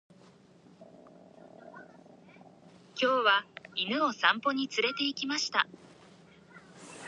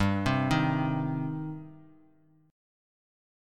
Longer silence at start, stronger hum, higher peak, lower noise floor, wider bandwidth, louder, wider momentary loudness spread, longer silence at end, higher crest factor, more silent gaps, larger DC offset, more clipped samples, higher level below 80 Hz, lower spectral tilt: first, 0.8 s vs 0 s; neither; about the same, -10 dBFS vs -12 dBFS; second, -59 dBFS vs -63 dBFS; second, 11 kHz vs 13 kHz; about the same, -29 LUFS vs -29 LUFS; first, 24 LU vs 15 LU; second, 0 s vs 1.65 s; about the same, 24 dB vs 20 dB; neither; neither; neither; second, -82 dBFS vs -52 dBFS; second, -2.5 dB/octave vs -7 dB/octave